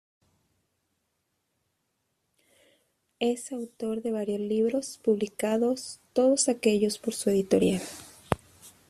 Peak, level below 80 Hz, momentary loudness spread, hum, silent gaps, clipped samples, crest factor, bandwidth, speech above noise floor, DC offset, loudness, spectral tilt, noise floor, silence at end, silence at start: -2 dBFS; -62 dBFS; 10 LU; none; none; under 0.1%; 26 dB; 14.5 kHz; 51 dB; under 0.1%; -28 LUFS; -4.5 dB/octave; -78 dBFS; 0.2 s; 3.2 s